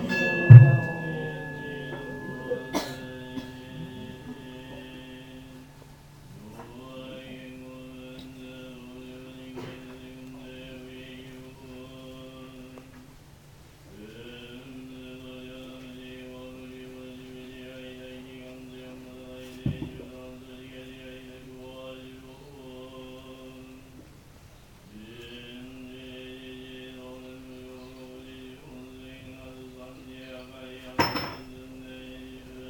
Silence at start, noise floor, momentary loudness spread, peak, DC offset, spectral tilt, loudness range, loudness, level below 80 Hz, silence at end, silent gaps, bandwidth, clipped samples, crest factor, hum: 0 s; -51 dBFS; 13 LU; 0 dBFS; under 0.1%; -7.5 dB/octave; 10 LU; -22 LUFS; -56 dBFS; 0 s; none; 17.5 kHz; under 0.1%; 28 dB; none